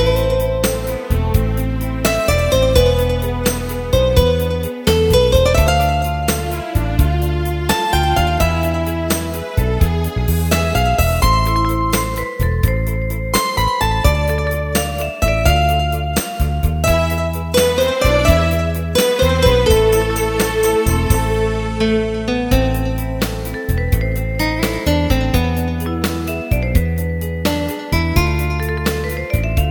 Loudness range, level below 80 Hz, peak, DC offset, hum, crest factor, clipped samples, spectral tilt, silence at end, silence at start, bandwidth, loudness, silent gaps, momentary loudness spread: 4 LU; -22 dBFS; 0 dBFS; under 0.1%; none; 16 dB; under 0.1%; -5 dB/octave; 0 s; 0 s; 20 kHz; -17 LUFS; none; 7 LU